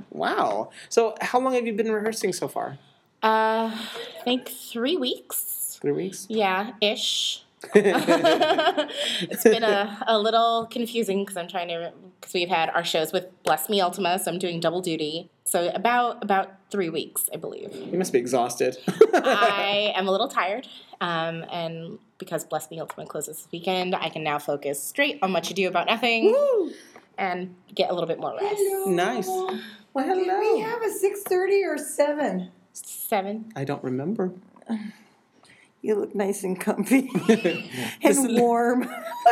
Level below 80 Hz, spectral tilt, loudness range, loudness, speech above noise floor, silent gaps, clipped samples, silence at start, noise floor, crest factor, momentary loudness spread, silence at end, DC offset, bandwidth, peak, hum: -82 dBFS; -3.5 dB/octave; 7 LU; -24 LUFS; 33 dB; none; under 0.1%; 0 s; -57 dBFS; 24 dB; 13 LU; 0 s; under 0.1%; 16.5 kHz; 0 dBFS; none